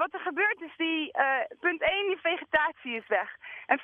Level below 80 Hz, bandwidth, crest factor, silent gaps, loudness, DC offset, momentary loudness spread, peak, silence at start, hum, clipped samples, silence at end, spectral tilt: -66 dBFS; 4.2 kHz; 18 dB; none; -28 LUFS; under 0.1%; 4 LU; -10 dBFS; 0 s; none; under 0.1%; 0 s; -5.5 dB/octave